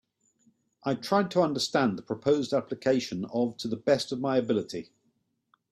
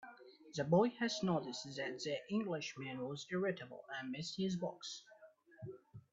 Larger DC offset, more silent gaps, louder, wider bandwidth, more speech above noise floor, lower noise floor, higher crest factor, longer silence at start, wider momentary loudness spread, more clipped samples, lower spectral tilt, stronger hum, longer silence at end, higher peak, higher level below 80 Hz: neither; neither; first, -28 LUFS vs -40 LUFS; first, 14.5 kHz vs 8 kHz; first, 46 dB vs 23 dB; first, -74 dBFS vs -63 dBFS; about the same, 18 dB vs 20 dB; first, 0.85 s vs 0 s; second, 7 LU vs 19 LU; neither; about the same, -5.5 dB/octave vs -5 dB/octave; neither; first, 0.9 s vs 0.1 s; first, -10 dBFS vs -20 dBFS; first, -70 dBFS vs -80 dBFS